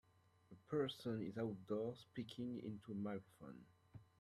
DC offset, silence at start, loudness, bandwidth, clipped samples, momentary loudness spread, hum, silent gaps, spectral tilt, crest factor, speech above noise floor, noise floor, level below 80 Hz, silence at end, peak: under 0.1%; 0.5 s; -47 LUFS; 13.5 kHz; under 0.1%; 21 LU; none; none; -7 dB/octave; 18 dB; 23 dB; -70 dBFS; -82 dBFS; 0.15 s; -30 dBFS